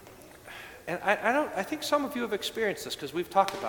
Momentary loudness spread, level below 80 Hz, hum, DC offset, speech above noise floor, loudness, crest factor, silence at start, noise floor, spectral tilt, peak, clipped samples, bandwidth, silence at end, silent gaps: 18 LU; -64 dBFS; none; under 0.1%; 20 dB; -30 LUFS; 22 dB; 0 s; -50 dBFS; -3.5 dB/octave; -8 dBFS; under 0.1%; 19 kHz; 0 s; none